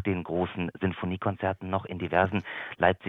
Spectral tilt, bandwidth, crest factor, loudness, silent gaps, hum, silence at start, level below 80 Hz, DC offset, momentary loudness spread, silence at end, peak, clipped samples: -9 dB/octave; 4 kHz; 22 dB; -30 LUFS; none; none; 0 s; -56 dBFS; under 0.1%; 6 LU; 0 s; -6 dBFS; under 0.1%